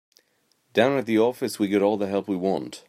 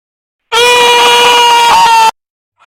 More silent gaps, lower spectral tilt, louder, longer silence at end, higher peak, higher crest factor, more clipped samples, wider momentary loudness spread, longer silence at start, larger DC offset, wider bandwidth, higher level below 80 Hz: neither; first, -5.5 dB/octave vs 0.5 dB/octave; second, -24 LUFS vs -5 LUFS; second, 0.1 s vs 0.55 s; second, -6 dBFS vs 0 dBFS; first, 20 dB vs 8 dB; neither; about the same, 5 LU vs 5 LU; first, 0.75 s vs 0.5 s; neither; about the same, 16 kHz vs 17 kHz; second, -72 dBFS vs -46 dBFS